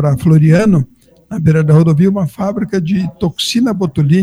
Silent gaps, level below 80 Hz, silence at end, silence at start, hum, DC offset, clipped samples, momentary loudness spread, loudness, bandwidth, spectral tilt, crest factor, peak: none; -40 dBFS; 0 s; 0 s; none; under 0.1%; under 0.1%; 9 LU; -12 LUFS; 12.5 kHz; -7 dB/octave; 12 dB; 0 dBFS